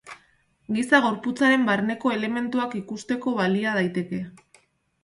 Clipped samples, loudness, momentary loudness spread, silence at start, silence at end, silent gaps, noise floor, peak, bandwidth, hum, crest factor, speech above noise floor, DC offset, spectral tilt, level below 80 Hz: under 0.1%; -24 LUFS; 13 LU; 0.05 s; 0.65 s; none; -63 dBFS; -4 dBFS; 11.5 kHz; none; 20 dB; 39 dB; under 0.1%; -5.5 dB/octave; -66 dBFS